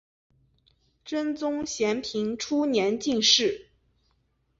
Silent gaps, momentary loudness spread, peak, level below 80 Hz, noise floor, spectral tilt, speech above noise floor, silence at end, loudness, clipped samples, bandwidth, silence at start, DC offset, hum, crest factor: none; 11 LU; -8 dBFS; -64 dBFS; -71 dBFS; -2.5 dB/octave; 45 dB; 1 s; -25 LUFS; under 0.1%; 7.8 kHz; 1.05 s; under 0.1%; none; 20 dB